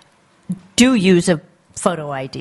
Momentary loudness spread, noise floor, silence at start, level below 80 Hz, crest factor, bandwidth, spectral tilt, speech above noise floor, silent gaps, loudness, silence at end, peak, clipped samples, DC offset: 18 LU; -43 dBFS; 0.5 s; -52 dBFS; 16 dB; 11.5 kHz; -5 dB/octave; 27 dB; none; -16 LUFS; 0 s; 0 dBFS; under 0.1%; under 0.1%